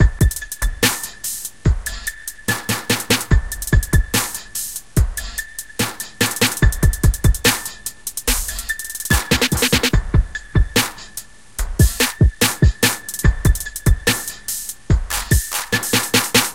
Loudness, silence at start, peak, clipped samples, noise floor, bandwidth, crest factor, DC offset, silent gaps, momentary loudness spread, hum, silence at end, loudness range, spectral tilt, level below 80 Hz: -19 LUFS; 0 s; 0 dBFS; under 0.1%; -37 dBFS; 17 kHz; 18 dB; 0.8%; none; 10 LU; none; 0 s; 2 LU; -3.5 dB/octave; -22 dBFS